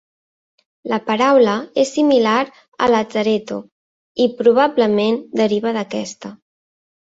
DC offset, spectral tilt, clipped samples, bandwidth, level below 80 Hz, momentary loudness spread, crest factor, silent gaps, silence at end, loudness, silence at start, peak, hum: under 0.1%; -5 dB/octave; under 0.1%; 8 kHz; -60 dBFS; 16 LU; 16 dB; 2.68-2.72 s, 3.72-4.15 s; 0.85 s; -17 LUFS; 0.85 s; -2 dBFS; none